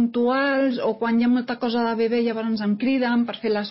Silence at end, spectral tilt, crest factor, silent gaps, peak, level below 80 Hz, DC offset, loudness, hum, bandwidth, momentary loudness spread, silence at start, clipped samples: 0 s; -10 dB/octave; 10 dB; none; -10 dBFS; -68 dBFS; under 0.1%; -22 LUFS; none; 5.8 kHz; 4 LU; 0 s; under 0.1%